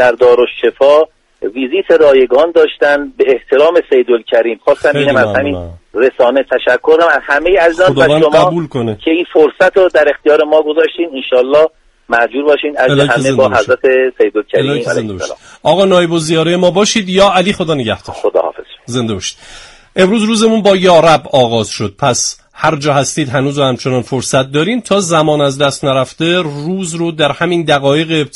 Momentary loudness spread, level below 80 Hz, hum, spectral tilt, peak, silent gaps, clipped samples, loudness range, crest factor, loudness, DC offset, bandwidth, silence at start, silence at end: 9 LU; -44 dBFS; none; -4.5 dB/octave; 0 dBFS; none; under 0.1%; 3 LU; 10 dB; -11 LUFS; under 0.1%; 11.5 kHz; 0 s; 0.1 s